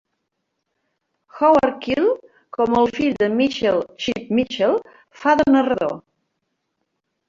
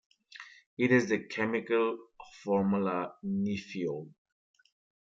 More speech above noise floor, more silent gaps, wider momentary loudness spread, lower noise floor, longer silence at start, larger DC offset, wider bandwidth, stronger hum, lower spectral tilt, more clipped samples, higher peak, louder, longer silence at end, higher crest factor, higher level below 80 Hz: first, 58 dB vs 22 dB; second, none vs 0.66-0.77 s; second, 10 LU vs 22 LU; first, -76 dBFS vs -52 dBFS; first, 1.35 s vs 0.35 s; neither; about the same, 7.4 kHz vs 7.6 kHz; neither; about the same, -5.5 dB/octave vs -6.5 dB/octave; neither; first, -4 dBFS vs -14 dBFS; first, -19 LUFS vs -31 LUFS; first, 1.3 s vs 1 s; about the same, 18 dB vs 20 dB; first, -54 dBFS vs -74 dBFS